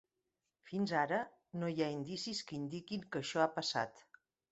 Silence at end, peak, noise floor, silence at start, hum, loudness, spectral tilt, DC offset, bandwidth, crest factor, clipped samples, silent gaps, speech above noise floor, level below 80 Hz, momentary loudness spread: 0.5 s; -18 dBFS; -88 dBFS; 0.65 s; none; -39 LUFS; -3.5 dB/octave; under 0.1%; 8 kHz; 22 dB; under 0.1%; none; 50 dB; -78 dBFS; 9 LU